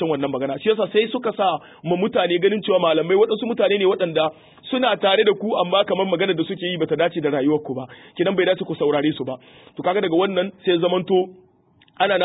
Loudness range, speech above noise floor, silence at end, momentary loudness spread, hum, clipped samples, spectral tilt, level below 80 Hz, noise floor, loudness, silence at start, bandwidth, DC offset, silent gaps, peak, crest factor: 3 LU; 37 dB; 0 s; 8 LU; none; under 0.1%; -10.5 dB/octave; -66 dBFS; -57 dBFS; -20 LUFS; 0 s; 4 kHz; under 0.1%; none; -4 dBFS; 16 dB